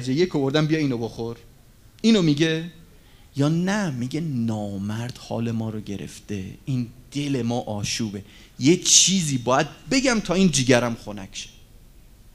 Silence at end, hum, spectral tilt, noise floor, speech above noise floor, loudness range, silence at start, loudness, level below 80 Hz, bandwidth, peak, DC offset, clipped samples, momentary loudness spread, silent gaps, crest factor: 0.05 s; none; -4 dB/octave; -50 dBFS; 27 dB; 9 LU; 0 s; -22 LUFS; -48 dBFS; 15.5 kHz; 0 dBFS; under 0.1%; under 0.1%; 15 LU; none; 24 dB